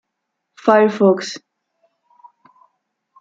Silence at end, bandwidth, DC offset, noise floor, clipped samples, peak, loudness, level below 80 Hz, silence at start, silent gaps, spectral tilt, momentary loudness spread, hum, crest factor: 1.85 s; 7.8 kHz; under 0.1%; -77 dBFS; under 0.1%; -2 dBFS; -16 LUFS; -72 dBFS; 0.65 s; none; -6 dB/octave; 16 LU; none; 18 dB